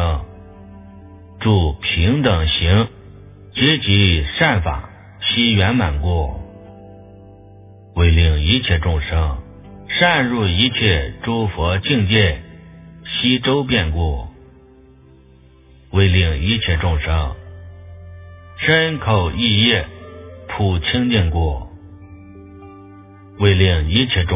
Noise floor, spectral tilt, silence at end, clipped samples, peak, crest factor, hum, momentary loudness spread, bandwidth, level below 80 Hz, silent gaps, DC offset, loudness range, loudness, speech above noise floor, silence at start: -47 dBFS; -10 dB/octave; 0 s; under 0.1%; 0 dBFS; 18 dB; none; 16 LU; 3.9 kHz; -26 dBFS; none; under 0.1%; 4 LU; -17 LUFS; 31 dB; 0 s